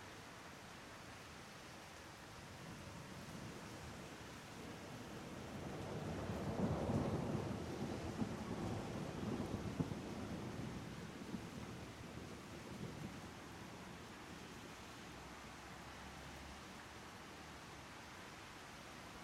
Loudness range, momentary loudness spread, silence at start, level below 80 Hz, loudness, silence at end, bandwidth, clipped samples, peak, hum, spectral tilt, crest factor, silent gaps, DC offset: 10 LU; 10 LU; 0 s; -64 dBFS; -49 LUFS; 0 s; 16 kHz; under 0.1%; -26 dBFS; none; -5.5 dB/octave; 22 dB; none; under 0.1%